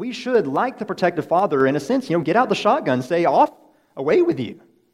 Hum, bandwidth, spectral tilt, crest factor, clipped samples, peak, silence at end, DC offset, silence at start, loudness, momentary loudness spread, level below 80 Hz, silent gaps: none; 13 kHz; -6.5 dB/octave; 18 dB; under 0.1%; -2 dBFS; 0.4 s; under 0.1%; 0 s; -20 LUFS; 7 LU; -66 dBFS; none